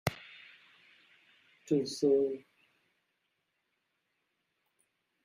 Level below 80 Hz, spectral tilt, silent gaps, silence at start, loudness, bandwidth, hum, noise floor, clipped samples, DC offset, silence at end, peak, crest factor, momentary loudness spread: -72 dBFS; -5.5 dB/octave; none; 0.05 s; -32 LUFS; 15.5 kHz; none; -81 dBFS; under 0.1%; under 0.1%; 2.85 s; -14 dBFS; 24 dB; 24 LU